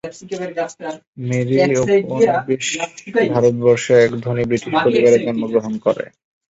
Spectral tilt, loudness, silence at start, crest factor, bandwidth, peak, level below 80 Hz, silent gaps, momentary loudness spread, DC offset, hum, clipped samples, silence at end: -5.5 dB/octave; -17 LUFS; 0.05 s; 14 dB; 8 kHz; -2 dBFS; -54 dBFS; 1.07-1.13 s; 13 LU; under 0.1%; none; under 0.1%; 0.45 s